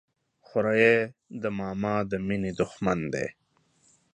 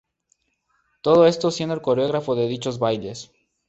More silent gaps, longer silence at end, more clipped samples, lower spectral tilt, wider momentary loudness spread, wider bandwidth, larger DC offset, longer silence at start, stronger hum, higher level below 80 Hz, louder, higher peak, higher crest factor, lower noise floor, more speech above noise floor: neither; first, 0.8 s vs 0.45 s; neither; about the same, -6.5 dB/octave vs -6 dB/octave; about the same, 12 LU vs 12 LU; first, 9.4 kHz vs 8.2 kHz; neither; second, 0.55 s vs 1.05 s; neither; about the same, -56 dBFS vs -60 dBFS; second, -27 LUFS vs -21 LUFS; about the same, -6 dBFS vs -4 dBFS; about the same, 22 dB vs 18 dB; about the same, -66 dBFS vs -69 dBFS; second, 39 dB vs 49 dB